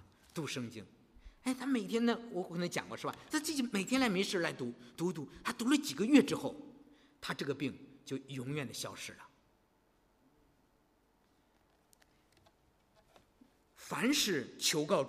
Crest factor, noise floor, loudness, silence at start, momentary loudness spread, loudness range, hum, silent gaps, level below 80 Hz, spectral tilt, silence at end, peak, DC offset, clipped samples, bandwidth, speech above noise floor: 24 dB; -72 dBFS; -35 LUFS; 0.35 s; 15 LU; 13 LU; none; none; -70 dBFS; -4 dB/octave; 0 s; -14 dBFS; under 0.1%; under 0.1%; 15.5 kHz; 37 dB